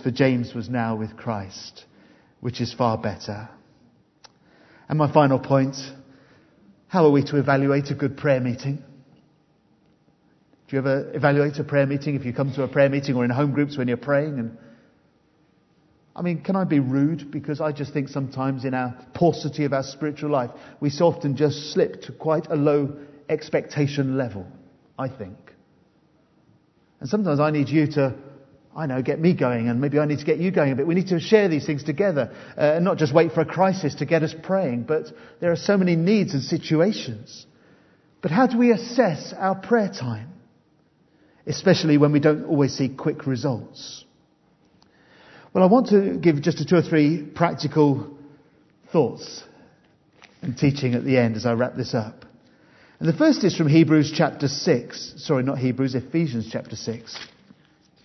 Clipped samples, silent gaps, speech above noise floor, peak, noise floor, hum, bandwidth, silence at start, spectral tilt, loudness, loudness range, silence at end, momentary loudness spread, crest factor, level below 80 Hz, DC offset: under 0.1%; none; 40 dB; -2 dBFS; -61 dBFS; none; 6.2 kHz; 0 s; -7 dB/octave; -22 LUFS; 6 LU; 0.8 s; 14 LU; 22 dB; -64 dBFS; under 0.1%